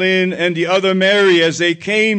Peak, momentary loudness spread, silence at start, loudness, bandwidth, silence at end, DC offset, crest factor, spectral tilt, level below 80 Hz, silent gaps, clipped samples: -4 dBFS; 6 LU; 0 s; -14 LUFS; 9.2 kHz; 0 s; under 0.1%; 10 dB; -4.5 dB/octave; -64 dBFS; none; under 0.1%